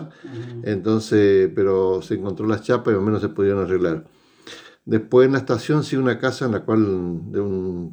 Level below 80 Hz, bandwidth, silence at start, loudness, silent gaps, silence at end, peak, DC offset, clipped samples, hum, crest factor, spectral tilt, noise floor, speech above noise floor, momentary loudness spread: -58 dBFS; 9.4 kHz; 0 s; -20 LUFS; none; 0 s; -4 dBFS; under 0.1%; under 0.1%; none; 16 dB; -7.5 dB/octave; -43 dBFS; 23 dB; 14 LU